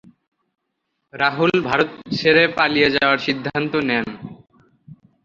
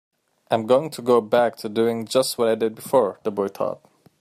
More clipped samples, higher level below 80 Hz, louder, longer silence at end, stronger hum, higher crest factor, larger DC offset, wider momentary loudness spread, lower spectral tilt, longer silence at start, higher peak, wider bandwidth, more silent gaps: neither; first, -56 dBFS vs -68 dBFS; first, -18 LUFS vs -22 LUFS; second, 0.3 s vs 0.45 s; neither; about the same, 20 dB vs 18 dB; neither; about the same, 8 LU vs 7 LU; first, -6 dB/octave vs -4.5 dB/octave; first, 1.15 s vs 0.5 s; about the same, -2 dBFS vs -4 dBFS; second, 7.4 kHz vs 15.5 kHz; neither